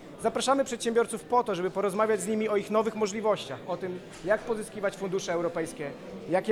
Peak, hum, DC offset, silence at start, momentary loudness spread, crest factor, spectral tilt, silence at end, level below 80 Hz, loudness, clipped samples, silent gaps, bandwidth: -12 dBFS; none; under 0.1%; 0 s; 9 LU; 16 dB; -4.5 dB/octave; 0 s; -62 dBFS; -29 LUFS; under 0.1%; none; 16 kHz